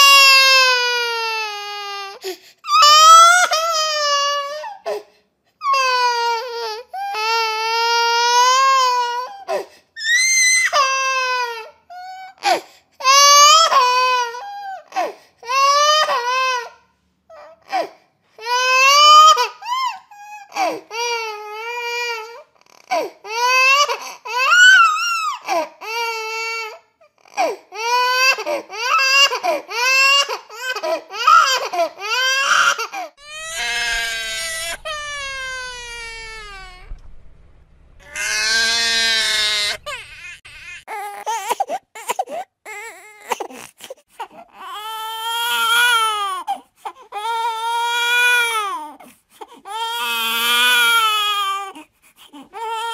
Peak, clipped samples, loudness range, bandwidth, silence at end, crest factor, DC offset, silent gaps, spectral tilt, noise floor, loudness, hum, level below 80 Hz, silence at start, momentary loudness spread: 0 dBFS; under 0.1%; 12 LU; 16 kHz; 0 s; 18 dB; under 0.1%; none; 2 dB/octave; -61 dBFS; -15 LUFS; none; -52 dBFS; 0 s; 21 LU